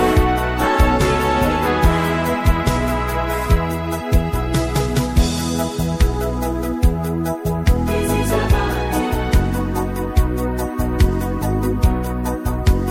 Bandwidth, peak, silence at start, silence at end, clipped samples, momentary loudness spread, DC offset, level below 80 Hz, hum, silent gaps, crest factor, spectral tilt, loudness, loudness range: 16.5 kHz; -2 dBFS; 0 s; 0 s; under 0.1%; 5 LU; under 0.1%; -22 dBFS; none; none; 16 dB; -6 dB/octave; -19 LUFS; 2 LU